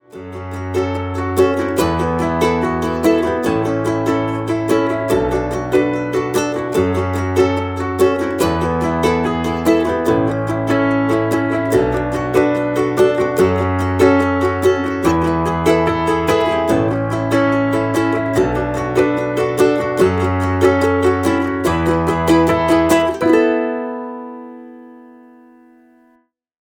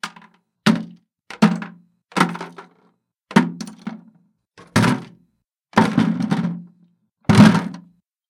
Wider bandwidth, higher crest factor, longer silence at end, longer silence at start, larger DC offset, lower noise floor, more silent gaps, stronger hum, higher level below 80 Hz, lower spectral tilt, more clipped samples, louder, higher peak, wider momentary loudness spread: first, 18.5 kHz vs 14.5 kHz; second, 14 dB vs 20 dB; first, 1.55 s vs 0.5 s; about the same, 0.15 s vs 0.05 s; neither; second, -58 dBFS vs -68 dBFS; neither; neither; first, -38 dBFS vs -52 dBFS; about the same, -6.5 dB/octave vs -6 dB/octave; neither; about the same, -16 LUFS vs -18 LUFS; about the same, -2 dBFS vs 0 dBFS; second, 6 LU vs 22 LU